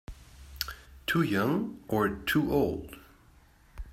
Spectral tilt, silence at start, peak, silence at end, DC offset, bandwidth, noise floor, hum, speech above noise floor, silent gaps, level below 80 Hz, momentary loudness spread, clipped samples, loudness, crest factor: -6 dB/octave; 0.1 s; -8 dBFS; 0 s; under 0.1%; 16 kHz; -59 dBFS; none; 30 dB; none; -50 dBFS; 22 LU; under 0.1%; -30 LUFS; 24 dB